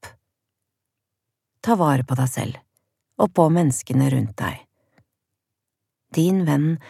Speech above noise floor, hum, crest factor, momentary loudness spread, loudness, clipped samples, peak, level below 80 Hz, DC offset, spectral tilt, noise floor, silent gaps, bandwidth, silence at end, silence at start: 63 dB; none; 22 dB; 13 LU; -21 LUFS; under 0.1%; -2 dBFS; -60 dBFS; under 0.1%; -7 dB/octave; -82 dBFS; none; 15 kHz; 0.15 s; 0.05 s